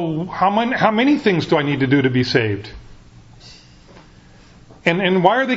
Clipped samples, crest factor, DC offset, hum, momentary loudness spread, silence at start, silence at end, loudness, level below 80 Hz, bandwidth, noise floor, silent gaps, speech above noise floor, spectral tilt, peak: under 0.1%; 18 dB; under 0.1%; none; 8 LU; 0 s; 0 s; -17 LUFS; -48 dBFS; 7.8 kHz; -46 dBFS; none; 29 dB; -6.5 dB/octave; 0 dBFS